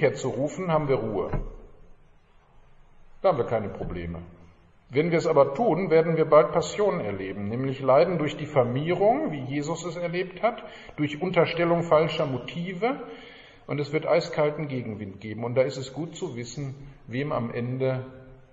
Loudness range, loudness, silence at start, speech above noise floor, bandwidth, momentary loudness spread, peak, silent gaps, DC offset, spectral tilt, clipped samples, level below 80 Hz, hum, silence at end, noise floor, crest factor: 8 LU; -26 LUFS; 0 s; 31 dB; 8 kHz; 14 LU; -6 dBFS; none; under 0.1%; -6.5 dB/octave; under 0.1%; -48 dBFS; none; 0.15 s; -56 dBFS; 20 dB